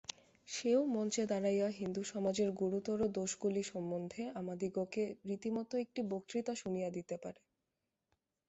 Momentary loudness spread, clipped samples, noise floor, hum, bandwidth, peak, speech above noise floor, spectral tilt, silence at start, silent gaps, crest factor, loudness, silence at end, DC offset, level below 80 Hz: 9 LU; under 0.1%; -88 dBFS; none; 8 kHz; -20 dBFS; 51 dB; -6 dB/octave; 0.1 s; none; 18 dB; -38 LUFS; 1.15 s; under 0.1%; -74 dBFS